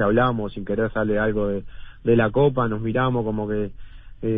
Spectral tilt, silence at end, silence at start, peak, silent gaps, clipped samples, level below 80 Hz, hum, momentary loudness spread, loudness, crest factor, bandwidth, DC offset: -12 dB/octave; 0 s; 0 s; -6 dBFS; none; under 0.1%; -40 dBFS; none; 9 LU; -23 LUFS; 16 dB; 3.9 kHz; under 0.1%